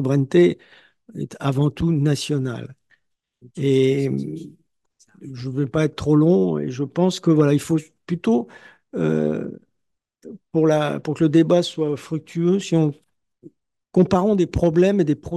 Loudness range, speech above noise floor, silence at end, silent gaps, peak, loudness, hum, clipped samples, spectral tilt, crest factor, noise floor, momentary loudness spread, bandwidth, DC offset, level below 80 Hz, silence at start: 4 LU; 58 dB; 0 s; none; -4 dBFS; -20 LUFS; none; under 0.1%; -7.5 dB/octave; 18 dB; -77 dBFS; 16 LU; 12.5 kHz; under 0.1%; -50 dBFS; 0 s